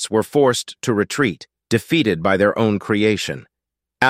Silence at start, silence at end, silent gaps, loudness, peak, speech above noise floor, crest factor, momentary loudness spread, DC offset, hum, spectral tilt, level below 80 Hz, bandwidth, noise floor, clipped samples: 0 s; 0 s; none; -19 LUFS; 0 dBFS; 66 dB; 18 dB; 7 LU; under 0.1%; none; -5 dB/octave; -56 dBFS; 16 kHz; -84 dBFS; under 0.1%